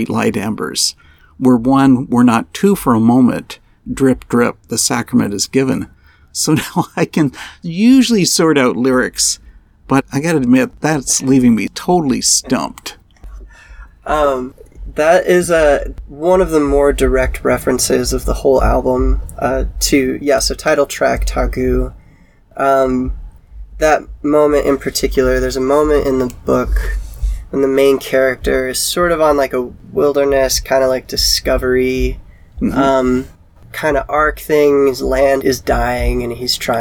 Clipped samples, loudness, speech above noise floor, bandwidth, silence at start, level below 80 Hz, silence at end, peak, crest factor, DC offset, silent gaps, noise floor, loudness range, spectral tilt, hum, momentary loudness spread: under 0.1%; -14 LUFS; 32 dB; 19 kHz; 0 s; -26 dBFS; 0 s; 0 dBFS; 14 dB; 0.2%; none; -46 dBFS; 3 LU; -4.5 dB/octave; none; 9 LU